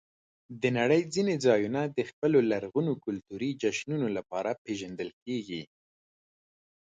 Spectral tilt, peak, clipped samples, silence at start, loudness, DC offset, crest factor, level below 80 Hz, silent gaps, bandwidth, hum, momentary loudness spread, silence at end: -6 dB/octave; -10 dBFS; under 0.1%; 0.5 s; -30 LUFS; under 0.1%; 20 dB; -70 dBFS; 2.13-2.22 s, 4.58-4.65 s, 5.13-5.26 s; 9.4 kHz; none; 12 LU; 1.3 s